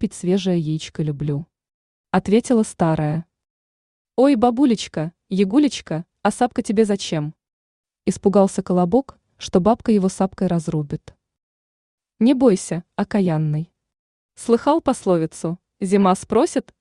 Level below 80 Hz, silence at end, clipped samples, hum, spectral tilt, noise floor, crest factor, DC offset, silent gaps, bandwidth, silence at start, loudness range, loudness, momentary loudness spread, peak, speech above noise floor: -52 dBFS; 0.2 s; under 0.1%; none; -6.5 dB/octave; under -90 dBFS; 18 dB; under 0.1%; 1.74-2.04 s, 3.50-4.05 s, 7.53-7.84 s, 11.43-11.98 s, 13.99-14.29 s; 11 kHz; 0 s; 2 LU; -20 LUFS; 12 LU; -2 dBFS; over 71 dB